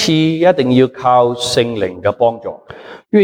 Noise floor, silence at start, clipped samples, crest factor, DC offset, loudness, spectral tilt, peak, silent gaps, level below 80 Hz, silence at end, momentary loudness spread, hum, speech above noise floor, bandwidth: -35 dBFS; 0 s; under 0.1%; 14 dB; under 0.1%; -14 LUFS; -5.5 dB/octave; 0 dBFS; none; -52 dBFS; 0 s; 17 LU; none; 22 dB; 17.5 kHz